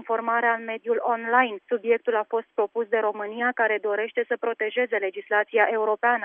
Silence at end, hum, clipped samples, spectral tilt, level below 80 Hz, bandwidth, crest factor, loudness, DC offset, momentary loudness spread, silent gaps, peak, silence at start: 0 s; none; under 0.1%; -7 dB/octave; under -90 dBFS; 3.7 kHz; 18 dB; -24 LUFS; under 0.1%; 6 LU; none; -6 dBFS; 0 s